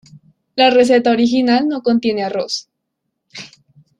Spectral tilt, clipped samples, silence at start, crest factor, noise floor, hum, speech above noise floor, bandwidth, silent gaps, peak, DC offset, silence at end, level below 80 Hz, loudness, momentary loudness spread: -4.5 dB/octave; under 0.1%; 0.55 s; 14 dB; -75 dBFS; none; 61 dB; 10.5 kHz; none; -2 dBFS; under 0.1%; 0.55 s; -60 dBFS; -15 LUFS; 18 LU